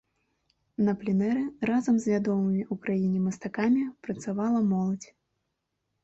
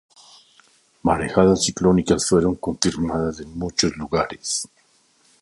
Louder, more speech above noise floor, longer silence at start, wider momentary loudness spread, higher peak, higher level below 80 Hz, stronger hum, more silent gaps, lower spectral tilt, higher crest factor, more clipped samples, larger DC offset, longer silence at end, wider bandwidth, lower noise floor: second, -28 LUFS vs -21 LUFS; first, 54 dB vs 39 dB; second, 0.8 s vs 1.05 s; about the same, 7 LU vs 9 LU; second, -14 dBFS vs 0 dBFS; second, -66 dBFS vs -42 dBFS; neither; neither; first, -8 dB/octave vs -4.5 dB/octave; second, 14 dB vs 22 dB; neither; neither; first, 1 s vs 0.75 s; second, 8.2 kHz vs 11.5 kHz; first, -81 dBFS vs -60 dBFS